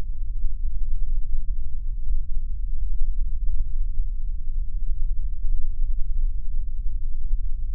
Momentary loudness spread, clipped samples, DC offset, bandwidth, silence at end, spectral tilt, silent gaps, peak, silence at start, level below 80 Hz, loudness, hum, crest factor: 3 LU; under 0.1%; under 0.1%; 0.3 kHz; 0 s; -15 dB/octave; none; -8 dBFS; 0 s; -22 dBFS; -33 LUFS; none; 10 dB